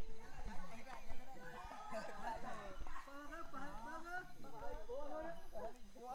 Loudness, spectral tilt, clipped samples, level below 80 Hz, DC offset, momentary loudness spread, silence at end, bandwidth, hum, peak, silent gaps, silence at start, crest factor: -52 LUFS; -4.5 dB/octave; under 0.1%; -54 dBFS; under 0.1%; 7 LU; 0 s; 14 kHz; none; -30 dBFS; none; 0 s; 14 dB